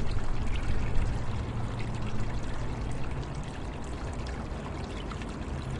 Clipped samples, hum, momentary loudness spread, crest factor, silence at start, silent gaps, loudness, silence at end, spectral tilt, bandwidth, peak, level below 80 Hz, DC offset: under 0.1%; none; 4 LU; 16 dB; 0 s; none; -36 LUFS; 0 s; -6.5 dB/octave; 10.5 kHz; -12 dBFS; -34 dBFS; under 0.1%